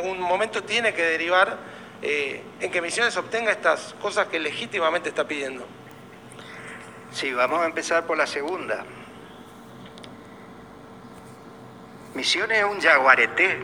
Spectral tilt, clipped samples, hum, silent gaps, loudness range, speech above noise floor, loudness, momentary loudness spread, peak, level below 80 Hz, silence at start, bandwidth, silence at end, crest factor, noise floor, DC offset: -2.5 dB/octave; under 0.1%; none; none; 10 LU; 21 dB; -23 LUFS; 25 LU; -2 dBFS; -66 dBFS; 0 s; 19.5 kHz; 0 s; 24 dB; -44 dBFS; under 0.1%